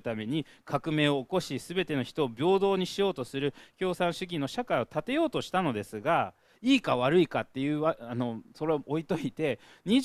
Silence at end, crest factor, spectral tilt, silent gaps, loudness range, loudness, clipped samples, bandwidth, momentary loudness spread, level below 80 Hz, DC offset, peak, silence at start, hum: 0 s; 18 dB; -6 dB/octave; none; 2 LU; -30 LUFS; under 0.1%; 14 kHz; 9 LU; -62 dBFS; under 0.1%; -10 dBFS; 0.05 s; none